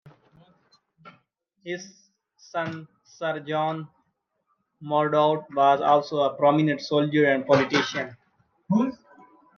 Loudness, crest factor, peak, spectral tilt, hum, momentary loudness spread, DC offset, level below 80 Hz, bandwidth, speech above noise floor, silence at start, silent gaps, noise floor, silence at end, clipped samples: -24 LUFS; 20 dB; -4 dBFS; -6 dB/octave; none; 15 LU; under 0.1%; -74 dBFS; 7 kHz; 51 dB; 0.05 s; none; -74 dBFS; 0.6 s; under 0.1%